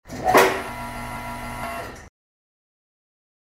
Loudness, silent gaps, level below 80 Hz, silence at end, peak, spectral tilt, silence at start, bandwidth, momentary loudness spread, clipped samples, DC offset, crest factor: -23 LUFS; none; -46 dBFS; 1.5 s; -2 dBFS; -3.5 dB/octave; 0.05 s; 16 kHz; 16 LU; under 0.1%; under 0.1%; 24 dB